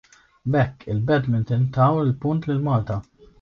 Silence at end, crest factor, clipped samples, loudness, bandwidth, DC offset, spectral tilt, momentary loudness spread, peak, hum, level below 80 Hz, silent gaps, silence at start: 0.4 s; 16 dB; under 0.1%; -22 LUFS; 6.6 kHz; under 0.1%; -9.5 dB/octave; 8 LU; -6 dBFS; none; -48 dBFS; none; 0.45 s